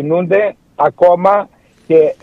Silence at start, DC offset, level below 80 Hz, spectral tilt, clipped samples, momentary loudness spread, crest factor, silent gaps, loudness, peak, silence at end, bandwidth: 0 s; under 0.1%; -56 dBFS; -8.5 dB/octave; under 0.1%; 7 LU; 12 dB; none; -13 LUFS; 0 dBFS; 0.1 s; 5.4 kHz